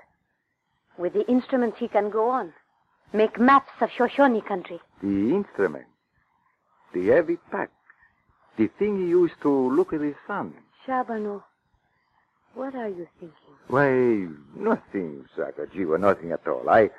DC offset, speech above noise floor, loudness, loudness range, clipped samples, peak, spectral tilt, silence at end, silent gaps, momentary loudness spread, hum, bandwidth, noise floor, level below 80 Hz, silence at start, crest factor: under 0.1%; 51 dB; -24 LUFS; 6 LU; under 0.1%; -6 dBFS; -8 dB/octave; 0.1 s; none; 14 LU; none; 7.6 kHz; -75 dBFS; -62 dBFS; 1 s; 20 dB